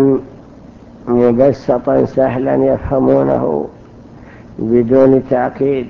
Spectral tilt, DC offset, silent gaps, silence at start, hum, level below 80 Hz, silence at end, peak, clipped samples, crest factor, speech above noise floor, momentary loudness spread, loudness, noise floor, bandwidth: -10 dB/octave; under 0.1%; none; 0 s; none; -38 dBFS; 0 s; 0 dBFS; under 0.1%; 14 dB; 25 dB; 10 LU; -13 LUFS; -37 dBFS; 6.6 kHz